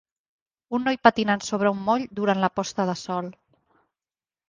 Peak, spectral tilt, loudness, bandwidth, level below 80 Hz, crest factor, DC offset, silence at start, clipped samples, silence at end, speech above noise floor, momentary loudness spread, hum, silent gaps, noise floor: -2 dBFS; -5 dB/octave; -24 LUFS; 9.8 kHz; -62 dBFS; 24 dB; under 0.1%; 0.7 s; under 0.1%; 1.15 s; over 67 dB; 11 LU; none; none; under -90 dBFS